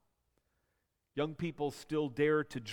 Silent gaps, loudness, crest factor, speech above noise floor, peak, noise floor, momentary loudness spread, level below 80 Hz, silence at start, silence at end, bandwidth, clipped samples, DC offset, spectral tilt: none; -35 LUFS; 18 dB; 47 dB; -20 dBFS; -82 dBFS; 8 LU; -70 dBFS; 1.15 s; 0 s; 16.5 kHz; under 0.1%; under 0.1%; -6 dB/octave